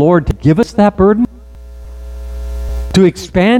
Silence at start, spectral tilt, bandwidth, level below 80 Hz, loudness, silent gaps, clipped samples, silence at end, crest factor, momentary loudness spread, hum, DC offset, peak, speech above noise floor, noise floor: 0 s; -7 dB/octave; 14.5 kHz; -24 dBFS; -12 LUFS; none; under 0.1%; 0 s; 12 dB; 19 LU; none; under 0.1%; 0 dBFS; 22 dB; -32 dBFS